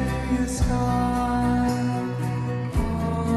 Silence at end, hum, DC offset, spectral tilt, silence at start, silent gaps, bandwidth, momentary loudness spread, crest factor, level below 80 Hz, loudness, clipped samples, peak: 0 s; none; under 0.1%; -6.5 dB/octave; 0 s; none; 13 kHz; 4 LU; 12 dB; -32 dBFS; -24 LUFS; under 0.1%; -10 dBFS